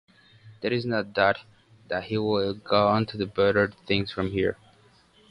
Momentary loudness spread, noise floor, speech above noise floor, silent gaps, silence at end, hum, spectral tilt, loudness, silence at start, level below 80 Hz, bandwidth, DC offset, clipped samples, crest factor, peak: 10 LU; -58 dBFS; 33 dB; none; 0.75 s; none; -7.5 dB/octave; -26 LUFS; 0.45 s; -54 dBFS; 10 kHz; under 0.1%; under 0.1%; 20 dB; -6 dBFS